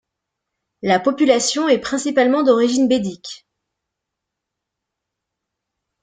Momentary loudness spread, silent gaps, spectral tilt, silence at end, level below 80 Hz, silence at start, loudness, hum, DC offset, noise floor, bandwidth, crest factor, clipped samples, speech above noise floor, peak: 12 LU; none; -3.5 dB/octave; 2.65 s; -62 dBFS; 0.85 s; -17 LUFS; none; under 0.1%; -81 dBFS; 9.6 kHz; 18 dB; under 0.1%; 65 dB; -2 dBFS